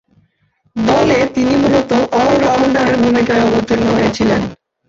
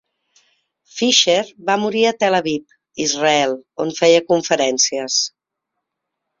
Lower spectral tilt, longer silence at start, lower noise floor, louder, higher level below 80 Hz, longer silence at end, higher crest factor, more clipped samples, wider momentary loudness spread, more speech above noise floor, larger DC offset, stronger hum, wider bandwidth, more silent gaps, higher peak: first, -6 dB/octave vs -2 dB/octave; second, 0.75 s vs 0.95 s; second, -60 dBFS vs -79 dBFS; first, -13 LUFS vs -17 LUFS; first, -40 dBFS vs -64 dBFS; second, 0.35 s vs 1.1 s; second, 12 dB vs 18 dB; neither; second, 3 LU vs 11 LU; second, 47 dB vs 62 dB; neither; neither; about the same, 7.6 kHz vs 7.6 kHz; neither; about the same, -2 dBFS vs 0 dBFS